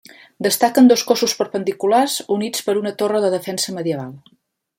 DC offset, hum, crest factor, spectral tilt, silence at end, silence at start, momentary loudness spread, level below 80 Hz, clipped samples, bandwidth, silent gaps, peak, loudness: under 0.1%; none; 16 dB; -3.5 dB/octave; 0.6 s; 0.4 s; 11 LU; -66 dBFS; under 0.1%; 16.5 kHz; none; -2 dBFS; -18 LUFS